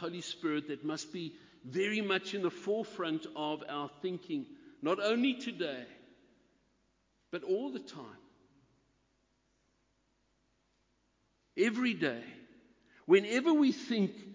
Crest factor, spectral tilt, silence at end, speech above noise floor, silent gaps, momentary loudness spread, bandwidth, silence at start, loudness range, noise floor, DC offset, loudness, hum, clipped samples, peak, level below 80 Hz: 22 dB; -5 dB/octave; 0 s; 42 dB; none; 17 LU; 7.6 kHz; 0 s; 11 LU; -76 dBFS; under 0.1%; -34 LUFS; none; under 0.1%; -14 dBFS; -80 dBFS